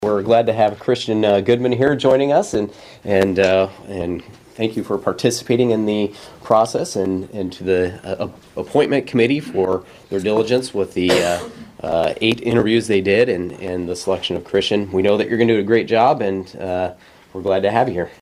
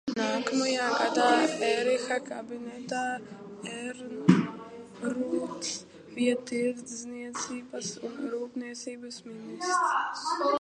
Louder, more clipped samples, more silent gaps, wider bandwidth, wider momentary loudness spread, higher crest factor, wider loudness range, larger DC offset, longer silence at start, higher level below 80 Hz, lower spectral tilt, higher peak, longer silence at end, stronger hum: first, -18 LUFS vs -30 LUFS; neither; neither; first, 15 kHz vs 11.5 kHz; second, 11 LU vs 15 LU; second, 18 dB vs 26 dB; second, 3 LU vs 6 LU; neither; about the same, 0 s vs 0.05 s; first, -52 dBFS vs -74 dBFS; about the same, -5.5 dB/octave vs -4.5 dB/octave; first, 0 dBFS vs -4 dBFS; about the same, 0.1 s vs 0 s; neither